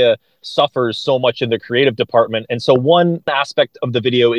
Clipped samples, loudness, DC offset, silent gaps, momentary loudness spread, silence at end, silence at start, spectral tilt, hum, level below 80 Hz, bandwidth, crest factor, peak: under 0.1%; -16 LUFS; under 0.1%; none; 6 LU; 0 s; 0 s; -6 dB/octave; none; -60 dBFS; 9.8 kHz; 16 dB; 0 dBFS